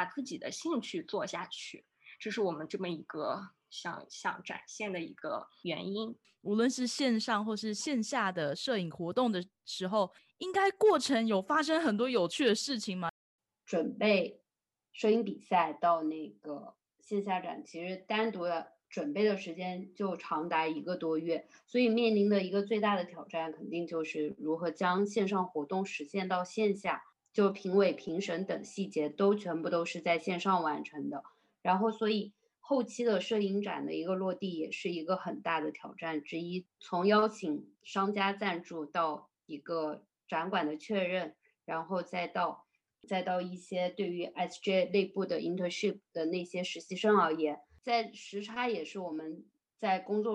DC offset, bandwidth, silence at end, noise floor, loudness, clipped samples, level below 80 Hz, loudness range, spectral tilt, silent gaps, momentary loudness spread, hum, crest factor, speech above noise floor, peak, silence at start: under 0.1%; 12 kHz; 0 s; under -90 dBFS; -34 LUFS; under 0.1%; -82 dBFS; 5 LU; -5 dB/octave; 13.10-13.39 s; 12 LU; none; 18 dB; over 57 dB; -14 dBFS; 0 s